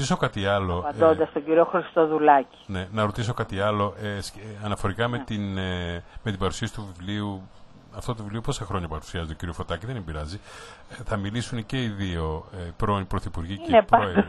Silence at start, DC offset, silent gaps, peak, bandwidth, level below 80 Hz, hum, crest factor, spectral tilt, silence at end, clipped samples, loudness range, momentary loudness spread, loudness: 0 s; under 0.1%; none; -2 dBFS; 12 kHz; -42 dBFS; none; 24 dB; -6 dB/octave; 0 s; under 0.1%; 10 LU; 14 LU; -26 LUFS